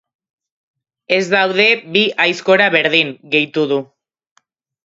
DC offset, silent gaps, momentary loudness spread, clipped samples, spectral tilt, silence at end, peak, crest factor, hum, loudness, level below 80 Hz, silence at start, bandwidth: under 0.1%; none; 6 LU; under 0.1%; -4 dB/octave; 1 s; 0 dBFS; 18 dB; none; -14 LUFS; -68 dBFS; 1.1 s; 8 kHz